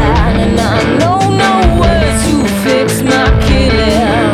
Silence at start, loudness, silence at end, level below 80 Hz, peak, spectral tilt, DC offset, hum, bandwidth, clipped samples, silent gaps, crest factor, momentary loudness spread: 0 s; -10 LUFS; 0 s; -16 dBFS; 0 dBFS; -5.5 dB/octave; under 0.1%; none; 15 kHz; under 0.1%; none; 10 dB; 2 LU